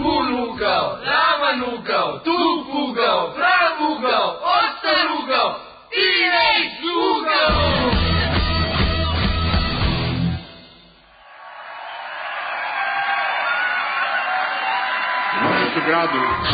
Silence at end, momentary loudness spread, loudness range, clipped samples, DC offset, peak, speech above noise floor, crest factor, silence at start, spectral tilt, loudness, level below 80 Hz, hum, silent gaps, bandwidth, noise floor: 0 s; 8 LU; 7 LU; under 0.1%; under 0.1%; -6 dBFS; 29 dB; 14 dB; 0 s; -10 dB/octave; -19 LUFS; -32 dBFS; none; none; 5 kHz; -48 dBFS